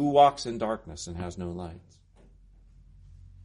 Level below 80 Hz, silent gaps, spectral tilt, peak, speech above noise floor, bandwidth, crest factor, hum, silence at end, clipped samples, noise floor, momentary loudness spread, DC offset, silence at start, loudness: -52 dBFS; none; -5.5 dB/octave; -6 dBFS; 29 dB; 10.5 kHz; 22 dB; none; 1.65 s; under 0.1%; -56 dBFS; 18 LU; under 0.1%; 0 s; -28 LUFS